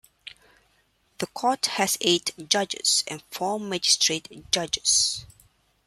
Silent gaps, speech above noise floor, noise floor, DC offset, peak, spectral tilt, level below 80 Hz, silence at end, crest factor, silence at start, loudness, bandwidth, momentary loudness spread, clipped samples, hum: none; 41 dB; -66 dBFS; under 0.1%; -4 dBFS; -1 dB/octave; -62 dBFS; 0.6 s; 22 dB; 0.25 s; -23 LUFS; 15.5 kHz; 15 LU; under 0.1%; none